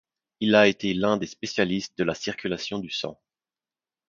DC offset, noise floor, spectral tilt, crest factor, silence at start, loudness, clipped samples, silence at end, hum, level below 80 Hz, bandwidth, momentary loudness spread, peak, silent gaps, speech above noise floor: under 0.1%; under -90 dBFS; -5 dB/octave; 22 dB; 0.4 s; -25 LUFS; under 0.1%; 0.95 s; none; -60 dBFS; 7.4 kHz; 12 LU; -4 dBFS; none; over 65 dB